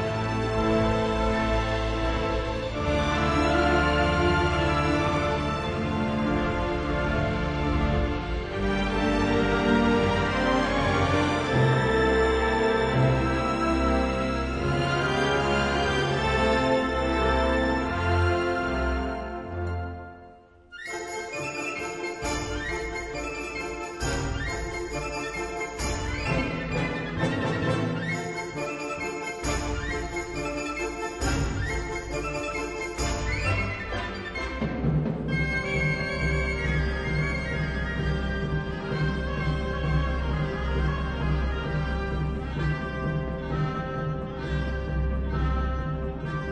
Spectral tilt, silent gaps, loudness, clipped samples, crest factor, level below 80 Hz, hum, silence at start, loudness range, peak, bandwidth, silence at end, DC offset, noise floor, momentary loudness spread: -6 dB/octave; none; -27 LUFS; under 0.1%; 18 dB; -34 dBFS; none; 0 s; 7 LU; -10 dBFS; 11 kHz; 0 s; under 0.1%; -50 dBFS; 9 LU